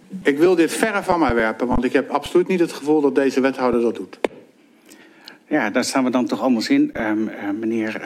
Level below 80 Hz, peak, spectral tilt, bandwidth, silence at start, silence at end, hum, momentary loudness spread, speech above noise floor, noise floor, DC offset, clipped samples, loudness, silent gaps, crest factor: -44 dBFS; -2 dBFS; -5 dB/octave; 15.5 kHz; 0.1 s; 0 s; none; 7 LU; 32 dB; -50 dBFS; under 0.1%; under 0.1%; -20 LUFS; none; 18 dB